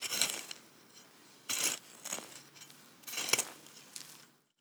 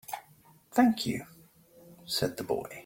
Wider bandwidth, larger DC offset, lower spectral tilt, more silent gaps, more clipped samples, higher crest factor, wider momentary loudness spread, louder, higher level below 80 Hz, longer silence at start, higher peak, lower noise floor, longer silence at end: first, over 20 kHz vs 17 kHz; neither; second, 1 dB/octave vs -4.5 dB/octave; neither; neither; first, 32 dB vs 20 dB; first, 24 LU vs 19 LU; second, -35 LUFS vs -30 LUFS; second, under -90 dBFS vs -64 dBFS; about the same, 0 s vs 0.1 s; first, -8 dBFS vs -12 dBFS; about the same, -60 dBFS vs -60 dBFS; first, 0.35 s vs 0.05 s